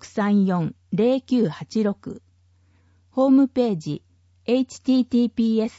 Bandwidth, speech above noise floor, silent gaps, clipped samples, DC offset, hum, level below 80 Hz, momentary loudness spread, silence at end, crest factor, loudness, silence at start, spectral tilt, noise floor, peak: 8 kHz; 38 dB; none; under 0.1%; under 0.1%; none; -62 dBFS; 15 LU; 0.1 s; 14 dB; -22 LUFS; 0 s; -7.5 dB/octave; -59 dBFS; -8 dBFS